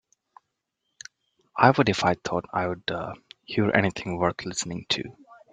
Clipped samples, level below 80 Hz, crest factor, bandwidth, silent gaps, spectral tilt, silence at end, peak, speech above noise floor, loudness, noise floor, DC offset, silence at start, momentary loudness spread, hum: under 0.1%; -60 dBFS; 24 dB; 9.6 kHz; none; -4.5 dB/octave; 0.2 s; -2 dBFS; 55 dB; -25 LUFS; -80 dBFS; under 0.1%; 1.55 s; 23 LU; none